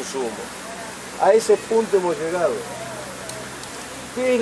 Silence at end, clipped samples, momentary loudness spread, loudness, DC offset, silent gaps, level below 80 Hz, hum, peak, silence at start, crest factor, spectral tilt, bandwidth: 0 s; under 0.1%; 15 LU; -23 LUFS; under 0.1%; none; -56 dBFS; none; -4 dBFS; 0 s; 20 dB; -3.5 dB/octave; 11 kHz